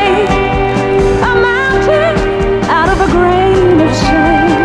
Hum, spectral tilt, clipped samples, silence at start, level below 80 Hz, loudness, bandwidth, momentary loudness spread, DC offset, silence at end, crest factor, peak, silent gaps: none; -6 dB/octave; under 0.1%; 0 s; -22 dBFS; -10 LUFS; 11 kHz; 3 LU; under 0.1%; 0 s; 10 dB; 0 dBFS; none